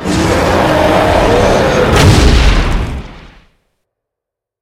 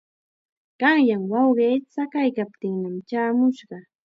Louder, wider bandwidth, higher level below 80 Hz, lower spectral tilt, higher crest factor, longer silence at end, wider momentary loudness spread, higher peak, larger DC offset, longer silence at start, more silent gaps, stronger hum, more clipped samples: first, -10 LUFS vs -22 LUFS; first, 16 kHz vs 6 kHz; first, -16 dBFS vs -78 dBFS; second, -5.5 dB/octave vs -7.5 dB/octave; second, 10 dB vs 18 dB; first, 1.4 s vs 0.25 s; about the same, 9 LU vs 10 LU; first, 0 dBFS vs -4 dBFS; neither; second, 0 s vs 0.8 s; neither; neither; first, 0.4% vs under 0.1%